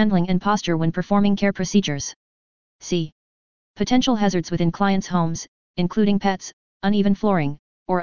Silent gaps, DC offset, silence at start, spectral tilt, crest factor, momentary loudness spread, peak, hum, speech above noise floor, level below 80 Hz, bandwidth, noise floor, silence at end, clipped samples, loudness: 2.16-2.79 s, 3.12-3.74 s, 5.48-5.74 s, 6.53-6.80 s, 7.59-7.86 s; 2%; 0 s; -6 dB/octave; 16 dB; 11 LU; -4 dBFS; none; over 70 dB; -48 dBFS; 7.2 kHz; under -90 dBFS; 0 s; under 0.1%; -21 LUFS